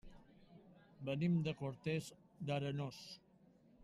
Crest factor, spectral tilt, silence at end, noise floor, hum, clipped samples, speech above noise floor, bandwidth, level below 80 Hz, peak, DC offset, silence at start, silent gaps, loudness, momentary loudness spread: 16 dB; -7 dB/octave; 0 s; -68 dBFS; none; under 0.1%; 28 dB; 13 kHz; -70 dBFS; -26 dBFS; under 0.1%; 0.05 s; none; -42 LUFS; 18 LU